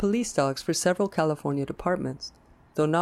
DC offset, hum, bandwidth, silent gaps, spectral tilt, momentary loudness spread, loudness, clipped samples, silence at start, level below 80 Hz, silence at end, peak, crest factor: under 0.1%; none; 15 kHz; none; -5 dB/octave; 10 LU; -27 LUFS; under 0.1%; 0 s; -54 dBFS; 0 s; -10 dBFS; 16 dB